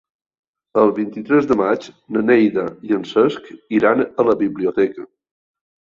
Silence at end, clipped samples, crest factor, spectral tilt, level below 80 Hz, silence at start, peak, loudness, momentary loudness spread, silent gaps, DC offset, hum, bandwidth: 0.9 s; under 0.1%; 16 dB; -7.5 dB/octave; -58 dBFS; 0.75 s; -2 dBFS; -18 LUFS; 9 LU; none; under 0.1%; none; 7.4 kHz